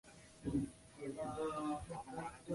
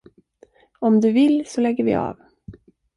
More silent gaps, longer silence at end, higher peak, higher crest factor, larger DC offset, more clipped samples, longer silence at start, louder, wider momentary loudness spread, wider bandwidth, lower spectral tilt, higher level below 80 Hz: neither; second, 0 s vs 0.45 s; second, -28 dBFS vs -8 dBFS; about the same, 16 dB vs 14 dB; neither; neither; second, 0.05 s vs 0.8 s; second, -44 LUFS vs -19 LUFS; about the same, 7 LU vs 8 LU; about the same, 11.5 kHz vs 11 kHz; about the same, -6.5 dB/octave vs -7 dB/octave; second, -62 dBFS vs -56 dBFS